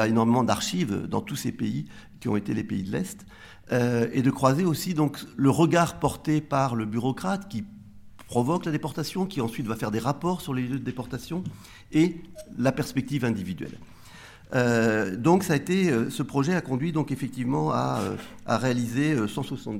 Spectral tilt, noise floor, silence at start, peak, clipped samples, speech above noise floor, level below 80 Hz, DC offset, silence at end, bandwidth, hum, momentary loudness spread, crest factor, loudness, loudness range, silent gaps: -6 dB/octave; -47 dBFS; 0 s; -6 dBFS; under 0.1%; 21 dB; -56 dBFS; under 0.1%; 0 s; 16.5 kHz; none; 12 LU; 20 dB; -26 LUFS; 5 LU; none